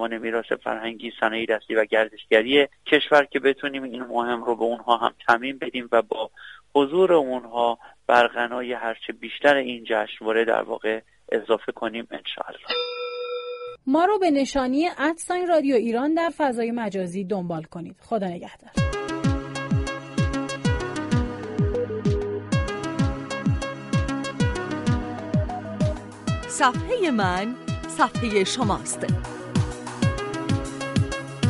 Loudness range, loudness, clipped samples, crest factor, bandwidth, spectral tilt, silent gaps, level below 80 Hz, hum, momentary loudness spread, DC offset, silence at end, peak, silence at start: 5 LU; -24 LUFS; under 0.1%; 22 dB; 11.5 kHz; -5.5 dB/octave; none; -40 dBFS; none; 11 LU; under 0.1%; 0 s; -2 dBFS; 0 s